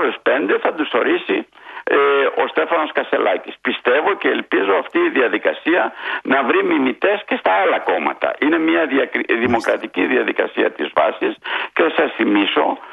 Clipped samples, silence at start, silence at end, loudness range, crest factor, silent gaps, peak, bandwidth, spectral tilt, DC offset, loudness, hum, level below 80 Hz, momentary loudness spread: under 0.1%; 0 s; 0 s; 1 LU; 16 dB; none; 0 dBFS; 9.8 kHz; -5.5 dB/octave; under 0.1%; -17 LUFS; none; -64 dBFS; 5 LU